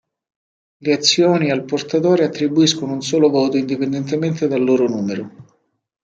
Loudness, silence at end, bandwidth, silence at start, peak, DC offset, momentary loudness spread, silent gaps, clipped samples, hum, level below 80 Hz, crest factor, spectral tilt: -17 LUFS; 0.6 s; 9 kHz; 0.8 s; -2 dBFS; under 0.1%; 8 LU; none; under 0.1%; none; -64 dBFS; 16 dB; -5 dB/octave